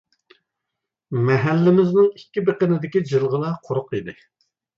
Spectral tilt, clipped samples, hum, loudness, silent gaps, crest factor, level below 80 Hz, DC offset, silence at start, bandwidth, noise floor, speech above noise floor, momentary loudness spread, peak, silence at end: -9 dB/octave; under 0.1%; none; -20 LUFS; none; 16 dB; -62 dBFS; under 0.1%; 1.1 s; 7.2 kHz; -82 dBFS; 63 dB; 12 LU; -6 dBFS; 0.65 s